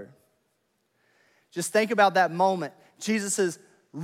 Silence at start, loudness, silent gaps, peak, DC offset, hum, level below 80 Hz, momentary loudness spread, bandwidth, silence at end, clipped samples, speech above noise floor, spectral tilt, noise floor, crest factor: 0 s; -25 LUFS; none; -8 dBFS; under 0.1%; none; -86 dBFS; 17 LU; 16.5 kHz; 0 s; under 0.1%; 49 dB; -3.5 dB/octave; -73 dBFS; 20 dB